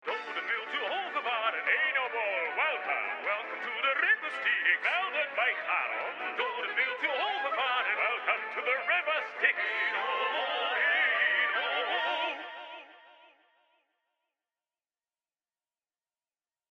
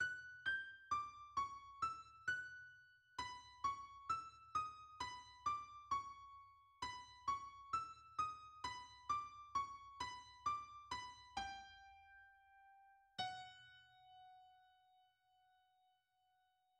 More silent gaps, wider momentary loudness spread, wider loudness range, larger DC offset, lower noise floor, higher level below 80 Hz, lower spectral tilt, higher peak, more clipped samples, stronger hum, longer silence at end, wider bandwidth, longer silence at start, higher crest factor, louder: neither; second, 7 LU vs 19 LU; second, 4 LU vs 9 LU; neither; first, under -90 dBFS vs -81 dBFS; second, under -90 dBFS vs -74 dBFS; about the same, -1.5 dB/octave vs -1.5 dB/octave; first, -12 dBFS vs -32 dBFS; neither; neither; first, 3.65 s vs 2.1 s; second, 9.2 kHz vs 11.5 kHz; about the same, 0.05 s vs 0 s; about the same, 20 dB vs 18 dB; first, -29 LUFS vs -47 LUFS